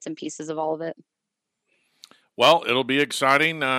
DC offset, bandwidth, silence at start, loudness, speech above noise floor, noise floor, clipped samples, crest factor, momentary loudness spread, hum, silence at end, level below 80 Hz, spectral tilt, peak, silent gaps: under 0.1%; 16 kHz; 0 s; -21 LUFS; 61 dB; -83 dBFS; under 0.1%; 22 dB; 15 LU; none; 0 s; -78 dBFS; -3.5 dB/octave; -2 dBFS; none